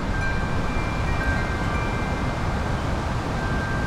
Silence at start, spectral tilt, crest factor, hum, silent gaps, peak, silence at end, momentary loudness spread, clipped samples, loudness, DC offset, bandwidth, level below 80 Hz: 0 s; -6 dB/octave; 12 dB; none; none; -12 dBFS; 0 s; 2 LU; under 0.1%; -26 LUFS; under 0.1%; 14 kHz; -28 dBFS